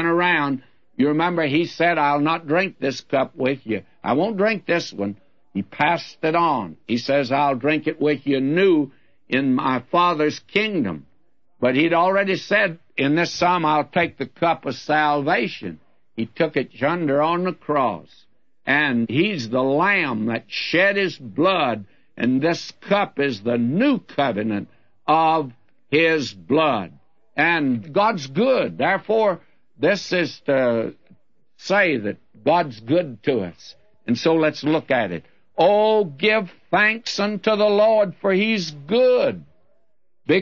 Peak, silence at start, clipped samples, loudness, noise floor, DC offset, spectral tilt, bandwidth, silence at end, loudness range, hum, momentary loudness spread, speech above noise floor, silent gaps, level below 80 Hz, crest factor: -4 dBFS; 0 s; under 0.1%; -20 LUFS; -72 dBFS; 0.2%; -6 dB/octave; 7.4 kHz; 0 s; 3 LU; none; 10 LU; 52 dB; none; -66 dBFS; 16 dB